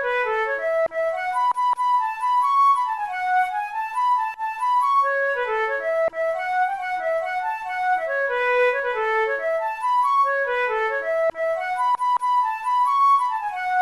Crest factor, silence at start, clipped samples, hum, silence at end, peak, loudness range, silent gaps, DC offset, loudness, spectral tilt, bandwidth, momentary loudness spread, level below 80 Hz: 12 dB; 0 s; under 0.1%; none; 0 s; -10 dBFS; 2 LU; none; under 0.1%; -22 LUFS; -1 dB/octave; 13 kHz; 6 LU; -62 dBFS